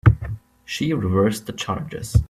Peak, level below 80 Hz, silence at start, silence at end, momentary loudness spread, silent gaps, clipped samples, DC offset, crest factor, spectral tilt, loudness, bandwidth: -2 dBFS; -32 dBFS; 0.05 s; 0.05 s; 12 LU; none; under 0.1%; under 0.1%; 20 dB; -6.5 dB/octave; -23 LUFS; 14 kHz